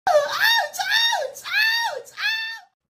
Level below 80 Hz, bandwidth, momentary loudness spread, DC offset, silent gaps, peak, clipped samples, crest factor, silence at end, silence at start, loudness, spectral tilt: -70 dBFS; 16 kHz; 8 LU; under 0.1%; none; -6 dBFS; under 0.1%; 16 dB; 0.3 s; 0.05 s; -20 LUFS; 1.5 dB/octave